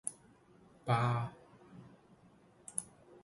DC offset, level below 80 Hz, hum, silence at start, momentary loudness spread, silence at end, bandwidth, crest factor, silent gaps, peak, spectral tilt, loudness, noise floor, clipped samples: under 0.1%; -70 dBFS; none; 0.05 s; 25 LU; 0.4 s; 11.5 kHz; 24 dB; none; -18 dBFS; -5 dB/octave; -37 LUFS; -64 dBFS; under 0.1%